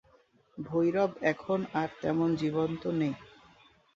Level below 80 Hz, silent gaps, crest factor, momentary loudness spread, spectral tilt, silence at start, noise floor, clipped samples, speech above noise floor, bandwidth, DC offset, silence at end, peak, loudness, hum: -66 dBFS; none; 20 dB; 7 LU; -7.5 dB/octave; 0.55 s; -65 dBFS; under 0.1%; 35 dB; 7.4 kHz; under 0.1%; 0.7 s; -12 dBFS; -31 LUFS; none